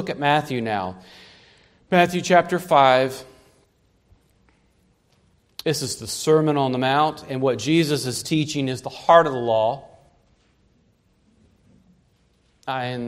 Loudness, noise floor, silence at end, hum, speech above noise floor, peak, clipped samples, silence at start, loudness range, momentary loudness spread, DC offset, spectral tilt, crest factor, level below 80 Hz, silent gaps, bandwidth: -20 LUFS; -62 dBFS; 0 s; none; 42 dB; 0 dBFS; under 0.1%; 0 s; 10 LU; 13 LU; under 0.1%; -5 dB/octave; 22 dB; -62 dBFS; none; 16 kHz